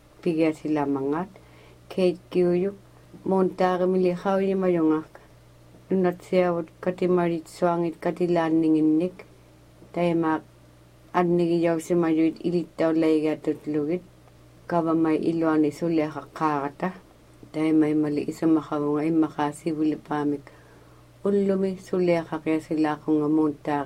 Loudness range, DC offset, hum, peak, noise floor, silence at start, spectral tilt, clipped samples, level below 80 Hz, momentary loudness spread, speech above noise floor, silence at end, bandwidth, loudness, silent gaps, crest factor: 2 LU; under 0.1%; none; -8 dBFS; -52 dBFS; 0.25 s; -7.5 dB/octave; under 0.1%; -60 dBFS; 7 LU; 29 dB; 0 s; 11.5 kHz; -25 LUFS; none; 16 dB